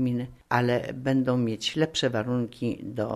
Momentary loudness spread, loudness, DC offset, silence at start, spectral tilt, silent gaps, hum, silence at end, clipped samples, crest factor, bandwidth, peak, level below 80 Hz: 7 LU; -27 LUFS; under 0.1%; 0 s; -5.5 dB/octave; none; none; 0 s; under 0.1%; 20 dB; 13 kHz; -8 dBFS; -58 dBFS